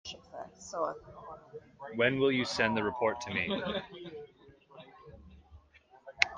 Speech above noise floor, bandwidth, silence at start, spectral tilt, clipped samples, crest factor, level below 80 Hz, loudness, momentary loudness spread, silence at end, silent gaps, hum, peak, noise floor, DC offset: 28 dB; 9.8 kHz; 0.05 s; -4.5 dB/octave; under 0.1%; 30 dB; -64 dBFS; -32 LUFS; 25 LU; 0 s; none; none; -4 dBFS; -61 dBFS; under 0.1%